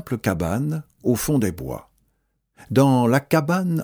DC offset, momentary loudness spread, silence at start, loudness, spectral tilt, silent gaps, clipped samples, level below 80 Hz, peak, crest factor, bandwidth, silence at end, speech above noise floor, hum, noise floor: under 0.1%; 11 LU; 0.05 s; -21 LUFS; -6.5 dB/octave; none; under 0.1%; -46 dBFS; -4 dBFS; 18 dB; over 20 kHz; 0 s; 50 dB; none; -70 dBFS